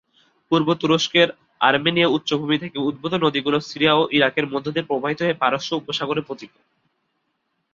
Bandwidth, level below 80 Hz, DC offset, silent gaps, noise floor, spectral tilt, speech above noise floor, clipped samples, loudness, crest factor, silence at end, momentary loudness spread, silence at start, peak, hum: 7.6 kHz; -62 dBFS; under 0.1%; none; -73 dBFS; -5 dB/octave; 52 dB; under 0.1%; -20 LUFS; 20 dB; 1.3 s; 8 LU; 0.5 s; -2 dBFS; none